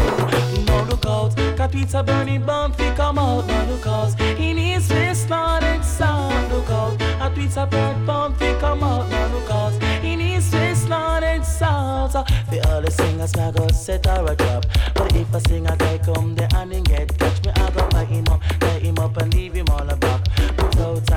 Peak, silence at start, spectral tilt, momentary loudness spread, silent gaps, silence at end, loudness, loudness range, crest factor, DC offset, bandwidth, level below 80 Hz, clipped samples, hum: -8 dBFS; 0 s; -6 dB/octave; 2 LU; none; 0 s; -20 LUFS; 1 LU; 10 dB; under 0.1%; 19 kHz; -24 dBFS; under 0.1%; none